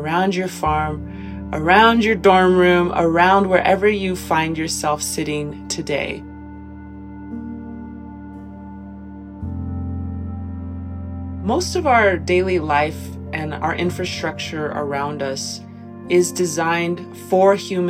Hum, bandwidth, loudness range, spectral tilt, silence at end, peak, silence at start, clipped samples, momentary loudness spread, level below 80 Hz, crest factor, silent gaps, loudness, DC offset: none; 15.5 kHz; 16 LU; -5 dB/octave; 0 s; -2 dBFS; 0 s; under 0.1%; 22 LU; -40 dBFS; 18 dB; none; -18 LUFS; under 0.1%